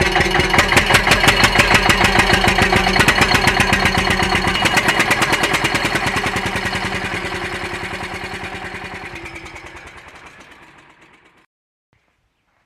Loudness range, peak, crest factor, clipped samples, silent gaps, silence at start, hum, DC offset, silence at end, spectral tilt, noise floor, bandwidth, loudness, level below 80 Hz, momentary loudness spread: 19 LU; 0 dBFS; 16 dB; under 0.1%; none; 0 s; none; under 0.1%; 2.25 s; -3 dB/octave; -65 dBFS; 16 kHz; -14 LUFS; -32 dBFS; 17 LU